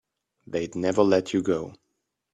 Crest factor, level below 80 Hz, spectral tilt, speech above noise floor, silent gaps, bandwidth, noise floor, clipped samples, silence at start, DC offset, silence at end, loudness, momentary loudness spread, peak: 20 dB; -62 dBFS; -6 dB/octave; 54 dB; none; 10.5 kHz; -78 dBFS; under 0.1%; 0.5 s; under 0.1%; 0.6 s; -25 LUFS; 11 LU; -6 dBFS